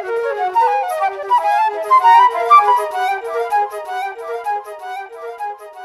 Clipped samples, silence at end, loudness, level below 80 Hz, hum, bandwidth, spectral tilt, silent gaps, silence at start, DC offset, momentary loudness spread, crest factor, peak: under 0.1%; 0 s; -15 LUFS; -68 dBFS; none; 14.5 kHz; -1 dB/octave; none; 0 s; under 0.1%; 18 LU; 16 dB; 0 dBFS